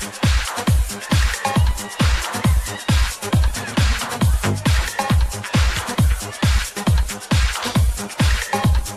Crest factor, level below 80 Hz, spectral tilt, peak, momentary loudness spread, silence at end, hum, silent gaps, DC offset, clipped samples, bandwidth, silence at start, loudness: 12 dB; -22 dBFS; -4.5 dB/octave; -6 dBFS; 2 LU; 0 s; none; none; under 0.1%; under 0.1%; 15 kHz; 0 s; -20 LUFS